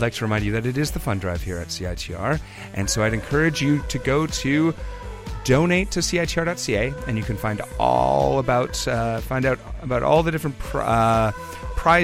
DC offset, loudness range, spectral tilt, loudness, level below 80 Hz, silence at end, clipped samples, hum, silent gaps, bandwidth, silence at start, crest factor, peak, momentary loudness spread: under 0.1%; 2 LU; -5 dB/octave; -22 LUFS; -34 dBFS; 0 s; under 0.1%; none; none; 16.5 kHz; 0 s; 16 dB; -4 dBFS; 10 LU